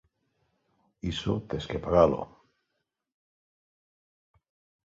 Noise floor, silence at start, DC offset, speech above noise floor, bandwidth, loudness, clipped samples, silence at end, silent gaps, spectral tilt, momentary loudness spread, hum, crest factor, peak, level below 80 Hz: -82 dBFS; 1.05 s; under 0.1%; 55 dB; 7.8 kHz; -28 LUFS; under 0.1%; 2.6 s; none; -7 dB/octave; 14 LU; none; 24 dB; -8 dBFS; -50 dBFS